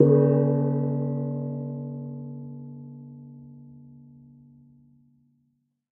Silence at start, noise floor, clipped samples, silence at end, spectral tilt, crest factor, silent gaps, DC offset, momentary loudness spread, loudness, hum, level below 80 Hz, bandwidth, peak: 0 s; -72 dBFS; under 0.1%; 1.9 s; -14 dB/octave; 24 dB; none; under 0.1%; 26 LU; -26 LUFS; none; -72 dBFS; 2.1 kHz; -4 dBFS